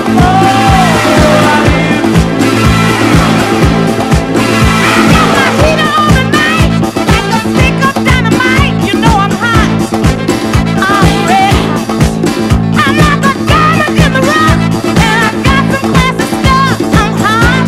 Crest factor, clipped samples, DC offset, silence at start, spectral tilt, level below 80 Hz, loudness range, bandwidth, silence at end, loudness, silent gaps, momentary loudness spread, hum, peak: 8 dB; 1%; under 0.1%; 0 s; -5.5 dB/octave; -20 dBFS; 1 LU; 15.5 kHz; 0 s; -8 LUFS; none; 4 LU; none; 0 dBFS